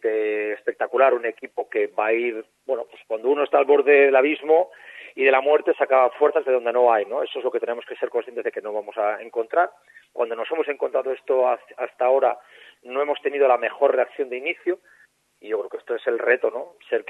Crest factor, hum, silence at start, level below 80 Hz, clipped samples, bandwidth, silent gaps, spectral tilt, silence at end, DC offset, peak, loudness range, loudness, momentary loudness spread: 18 dB; none; 0.05 s; -84 dBFS; under 0.1%; 4 kHz; none; -4.5 dB/octave; 0.1 s; under 0.1%; -4 dBFS; 7 LU; -22 LUFS; 12 LU